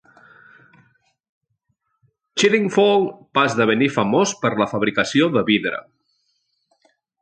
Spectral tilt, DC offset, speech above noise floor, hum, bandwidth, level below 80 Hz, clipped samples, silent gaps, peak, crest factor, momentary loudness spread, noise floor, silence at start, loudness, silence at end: -4.5 dB/octave; under 0.1%; 54 dB; none; 9.2 kHz; -62 dBFS; under 0.1%; none; -2 dBFS; 18 dB; 5 LU; -72 dBFS; 2.35 s; -18 LUFS; 1.4 s